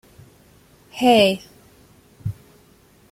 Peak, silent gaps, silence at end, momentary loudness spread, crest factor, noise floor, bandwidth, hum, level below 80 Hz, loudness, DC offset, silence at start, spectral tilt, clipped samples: -4 dBFS; none; 0.8 s; 23 LU; 20 dB; -53 dBFS; 16 kHz; none; -54 dBFS; -19 LUFS; under 0.1%; 0.95 s; -5 dB/octave; under 0.1%